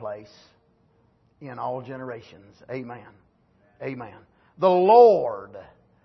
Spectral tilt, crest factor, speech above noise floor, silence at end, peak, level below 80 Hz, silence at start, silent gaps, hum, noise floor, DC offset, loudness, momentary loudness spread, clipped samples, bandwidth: -8 dB/octave; 20 dB; 40 dB; 0.4 s; -4 dBFS; -68 dBFS; 0 s; none; none; -63 dBFS; under 0.1%; -19 LUFS; 27 LU; under 0.1%; 6.2 kHz